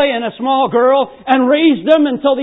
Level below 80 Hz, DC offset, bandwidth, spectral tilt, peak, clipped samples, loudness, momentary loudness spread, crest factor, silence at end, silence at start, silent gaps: -60 dBFS; under 0.1%; 4 kHz; -7.5 dB/octave; 0 dBFS; under 0.1%; -13 LUFS; 5 LU; 12 dB; 0 s; 0 s; none